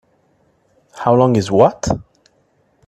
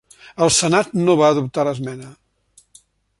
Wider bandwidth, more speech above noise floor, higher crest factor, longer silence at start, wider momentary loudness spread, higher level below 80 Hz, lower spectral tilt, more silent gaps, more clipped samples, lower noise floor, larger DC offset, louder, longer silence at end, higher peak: about the same, 12 kHz vs 11.5 kHz; first, 46 dB vs 39 dB; about the same, 18 dB vs 18 dB; first, 0.95 s vs 0.4 s; second, 9 LU vs 17 LU; first, -44 dBFS vs -54 dBFS; first, -6.5 dB/octave vs -4 dB/octave; neither; neither; about the same, -59 dBFS vs -56 dBFS; neither; about the same, -15 LUFS vs -17 LUFS; second, 0.85 s vs 1.1 s; about the same, 0 dBFS vs -2 dBFS